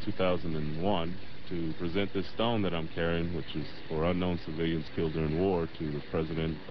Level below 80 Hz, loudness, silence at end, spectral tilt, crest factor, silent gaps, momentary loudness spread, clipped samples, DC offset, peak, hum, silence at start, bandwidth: -48 dBFS; -33 LUFS; 0 s; -9 dB/octave; 16 dB; none; 7 LU; under 0.1%; 2%; -16 dBFS; none; 0 s; 6 kHz